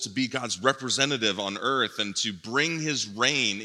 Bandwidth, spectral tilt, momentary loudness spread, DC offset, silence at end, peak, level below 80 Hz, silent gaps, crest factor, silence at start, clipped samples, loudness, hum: 13.5 kHz; -2.5 dB/octave; 5 LU; under 0.1%; 0 s; -6 dBFS; -78 dBFS; none; 22 dB; 0 s; under 0.1%; -26 LUFS; none